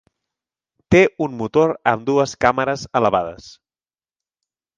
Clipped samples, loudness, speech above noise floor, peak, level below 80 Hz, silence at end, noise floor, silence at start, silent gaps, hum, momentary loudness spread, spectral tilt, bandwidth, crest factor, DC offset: under 0.1%; -18 LUFS; over 72 dB; 0 dBFS; -46 dBFS; 1.3 s; under -90 dBFS; 0.9 s; none; none; 7 LU; -6 dB/octave; 9.4 kHz; 20 dB; under 0.1%